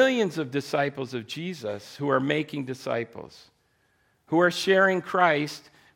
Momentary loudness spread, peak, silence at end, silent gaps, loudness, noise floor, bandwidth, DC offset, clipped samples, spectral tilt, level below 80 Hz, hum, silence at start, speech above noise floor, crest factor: 14 LU; -8 dBFS; 0.35 s; none; -26 LUFS; -68 dBFS; 16.5 kHz; under 0.1%; under 0.1%; -5 dB/octave; -74 dBFS; none; 0 s; 42 dB; 18 dB